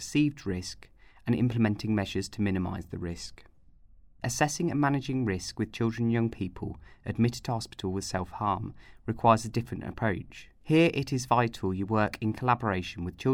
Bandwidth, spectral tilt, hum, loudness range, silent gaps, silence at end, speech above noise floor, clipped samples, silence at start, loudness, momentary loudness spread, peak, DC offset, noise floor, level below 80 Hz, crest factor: 16 kHz; -6 dB/octave; none; 4 LU; none; 0 s; 27 dB; under 0.1%; 0 s; -29 LUFS; 12 LU; -8 dBFS; under 0.1%; -55 dBFS; -54 dBFS; 22 dB